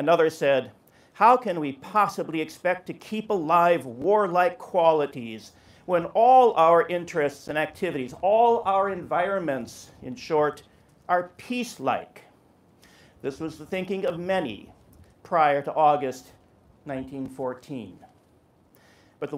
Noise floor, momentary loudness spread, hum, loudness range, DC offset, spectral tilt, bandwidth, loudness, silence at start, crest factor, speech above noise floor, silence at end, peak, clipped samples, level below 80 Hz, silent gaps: -60 dBFS; 17 LU; none; 10 LU; under 0.1%; -5.5 dB/octave; 15.5 kHz; -24 LUFS; 0 s; 18 dB; 36 dB; 0 s; -6 dBFS; under 0.1%; -66 dBFS; none